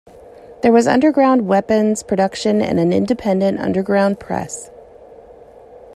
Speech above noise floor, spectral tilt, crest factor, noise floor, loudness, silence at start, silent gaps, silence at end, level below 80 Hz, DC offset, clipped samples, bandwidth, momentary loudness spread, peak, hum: 26 dB; -6 dB/octave; 16 dB; -42 dBFS; -16 LUFS; 0.5 s; none; 0.2 s; -52 dBFS; under 0.1%; under 0.1%; 12.5 kHz; 10 LU; 0 dBFS; none